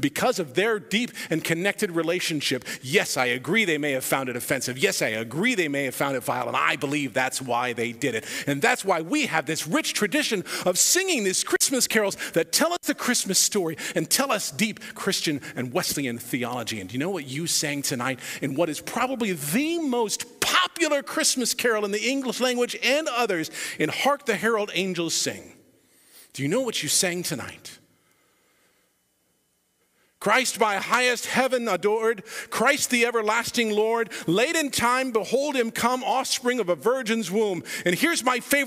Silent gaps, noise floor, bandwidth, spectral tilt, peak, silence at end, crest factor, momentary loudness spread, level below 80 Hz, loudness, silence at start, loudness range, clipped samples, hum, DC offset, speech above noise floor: none; -69 dBFS; 16 kHz; -2.5 dB/octave; -4 dBFS; 0 s; 20 dB; 7 LU; -66 dBFS; -24 LUFS; 0 s; 5 LU; under 0.1%; none; under 0.1%; 45 dB